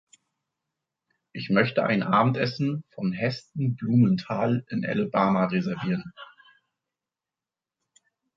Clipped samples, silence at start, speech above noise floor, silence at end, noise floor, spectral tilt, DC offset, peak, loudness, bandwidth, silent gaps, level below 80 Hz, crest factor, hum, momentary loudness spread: under 0.1%; 1.35 s; over 65 dB; 2.1 s; under -90 dBFS; -8 dB/octave; under 0.1%; -6 dBFS; -25 LUFS; 7.6 kHz; none; -66 dBFS; 22 dB; none; 9 LU